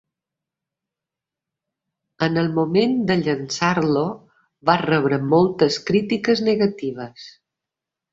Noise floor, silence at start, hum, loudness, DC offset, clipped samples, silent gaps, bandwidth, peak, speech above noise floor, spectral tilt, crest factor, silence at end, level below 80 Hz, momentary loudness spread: -87 dBFS; 2.2 s; none; -20 LUFS; under 0.1%; under 0.1%; none; 7.8 kHz; -2 dBFS; 68 dB; -6 dB/octave; 20 dB; 0.85 s; -60 dBFS; 10 LU